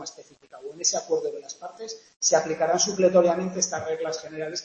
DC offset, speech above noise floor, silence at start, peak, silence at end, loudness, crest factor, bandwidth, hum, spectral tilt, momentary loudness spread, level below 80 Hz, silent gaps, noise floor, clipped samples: under 0.1%; 23 dB; 0 s; -6 dBFS; 0 s; -24 LUFS; 20 dB; 8.4 kHz; none; -2.5 dB/octave; 19 LU; -70 dBFS; 2.16-2.20 s; -48 dBFS; under 0.1%